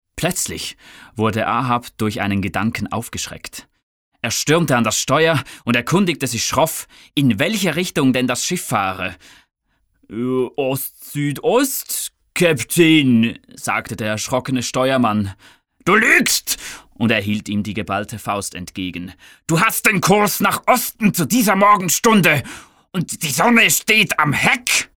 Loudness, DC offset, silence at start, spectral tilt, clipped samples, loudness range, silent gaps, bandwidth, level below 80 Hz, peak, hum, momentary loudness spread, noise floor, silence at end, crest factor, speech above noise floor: -17 LUFS; 0.1%; 0.15 s; -4 dB/octave; under 0.1%; 7 LU; 3.83-4.12 s; over 20 kHz; -52 dBFS; -2 dBFS; none; 14 LU; -64 dBFS; 0.15 s; 16 dB; 46 dB